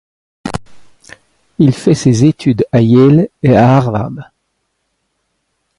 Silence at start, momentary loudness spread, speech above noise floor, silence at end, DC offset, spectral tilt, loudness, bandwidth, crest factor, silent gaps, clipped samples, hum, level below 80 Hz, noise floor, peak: 0.45 s; 18 LU; 57 dB; 1.55 s; under 0.1%; -7.5 dB/octave; -10 LUFS; 11.5 kHz; 12 dB; none; under 0.1%; none; -44 dBFS; -67 dBFS; 0 dBFS